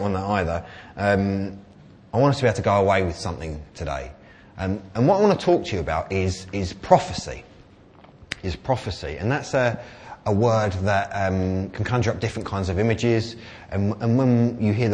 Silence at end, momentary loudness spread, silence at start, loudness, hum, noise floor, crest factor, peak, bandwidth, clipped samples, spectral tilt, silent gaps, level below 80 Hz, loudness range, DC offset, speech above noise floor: 0 s; 14 LU; 0 s; -23 LUFS; none; -49 dBFS; 22 dB; 0 dBFS; 9.8 kHz; under 0.1%; -6.5 dB/octave; none; -44 dBFS; 3 LU; under 0.1%; 27 dB